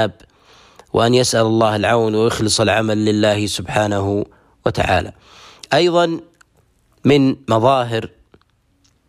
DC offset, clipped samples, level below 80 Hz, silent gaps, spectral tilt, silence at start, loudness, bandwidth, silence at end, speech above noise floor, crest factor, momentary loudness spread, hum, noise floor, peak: under 0.1%; under 0.1%; -46 dBFS; none; -5 dB/octave; 0 s; -16 LUFS; 15 kHz; 1 s; 43 dB; 14 dB; 9 LU; none; -59 dBFS; -2 dBFS